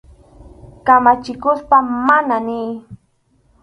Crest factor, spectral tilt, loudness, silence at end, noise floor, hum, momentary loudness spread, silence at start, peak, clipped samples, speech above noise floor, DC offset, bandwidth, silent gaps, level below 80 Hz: 16 dB; -6.5 dB/octave; -15 LUFS; 0.65 s; -59 dBFS; none; 13 LU; 0.45 s; 0 dBFS; under 0.1%; 45 dB; under 0.1%; 10.5 kHz; none; -48 dBFS